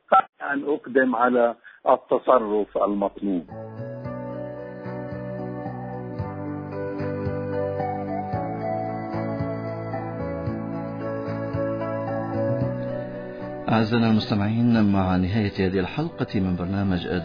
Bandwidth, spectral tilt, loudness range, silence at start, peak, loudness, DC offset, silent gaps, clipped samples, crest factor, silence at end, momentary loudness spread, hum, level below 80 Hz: 5.2 kHz; -9 dB/octave; 9 LU; 0.1 s; -4 dBFS; -25 LUFS; under 0.1%; 0.29-0.33 s; under 0.1%; 20 dB; 0 s; 13 LU; none; -52 dBFS